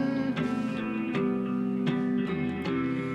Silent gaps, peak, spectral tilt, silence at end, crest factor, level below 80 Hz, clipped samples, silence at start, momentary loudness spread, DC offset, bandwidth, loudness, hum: none; -14 dBFS; -8 dB/octave; 0 s; 14 dB; -60 dBFS; under 0.1%; 0 s; 2 LU; under 0.1%; 8.4 kHz; -29 LUFS; none